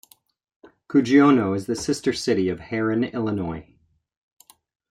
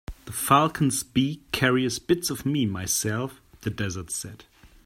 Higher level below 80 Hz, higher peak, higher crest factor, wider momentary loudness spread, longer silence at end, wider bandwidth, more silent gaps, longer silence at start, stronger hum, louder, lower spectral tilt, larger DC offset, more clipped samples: second, -58 dBFS vs -50 dBFS; about the same, -4 dBFS vs -4 dBFS; about the same, 18 dB vs 22 dB; about the same, 11 LU vs 13 LU; first, 1.3 s vs 0.2 s; second, 13.5 kHz vs 16.5 kHz; neither; first, 0.9 s vs 0.1 s; neither; first, -22 LUFS vs -25 LUFS; first, -6 dB/octave vs -4 dB/octave; neither; neither